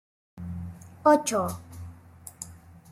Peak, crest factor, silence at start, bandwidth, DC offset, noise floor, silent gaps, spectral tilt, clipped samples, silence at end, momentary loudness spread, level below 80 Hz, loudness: -8 dBFS; 22 dB; 0.35 s; 16 kHz; under 0.1%; -49 dBFS; none; -5 dB/octave; under 0.1%; 0.15 s; 24 LU; -60 dBFS; -25 LUFS